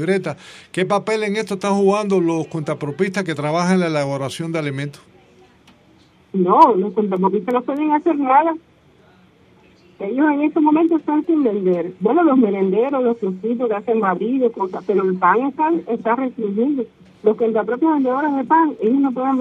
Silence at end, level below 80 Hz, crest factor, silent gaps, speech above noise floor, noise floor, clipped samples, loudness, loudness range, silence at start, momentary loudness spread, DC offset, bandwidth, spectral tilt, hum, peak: 0 s; -66 dBFS; 18 dB; none; 34 dB; -52 dBFS; under 0.1%; -18 LUFS; 3 LU; 0 s; 9 LU; under 0.1%; 11.5 kHz; -7 dB/octave; none; 0 dBFS